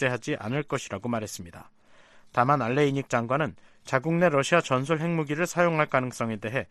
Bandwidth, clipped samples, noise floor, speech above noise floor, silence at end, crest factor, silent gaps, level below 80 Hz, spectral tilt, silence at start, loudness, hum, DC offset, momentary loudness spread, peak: 13.5 kHz; under 0.1%; -54 dBFS; 28 dB; 0.05 s; 22 dB; none; -62 dBFS; -5.5 dB/octave; 0 s; -26 LUFS; none; under 0.1%; 8 LU; -6 dBFS